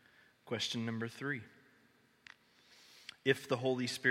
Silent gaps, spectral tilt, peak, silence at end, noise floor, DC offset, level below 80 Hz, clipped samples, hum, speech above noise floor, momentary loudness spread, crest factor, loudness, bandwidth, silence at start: none; -4.5 dB/octave; -16 dBFS; 0 s; -69 dBFS; under 0.1%; -82 dBFS; under 0.1%; none; 33 dB; 25 LU; 24 dB; -37 LUFS; 16 kHz; 0.45 s